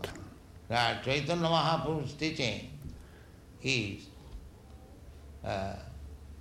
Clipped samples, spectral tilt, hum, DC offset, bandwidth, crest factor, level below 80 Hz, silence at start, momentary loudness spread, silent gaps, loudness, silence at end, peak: under 0.1%; -4.5 dB/octave; none; under 0.1%; 16 kHz; 22 dB; -52 dBFS; 0 s; 24 LU; none; -32 LUFS; 0 s; -14 dBFS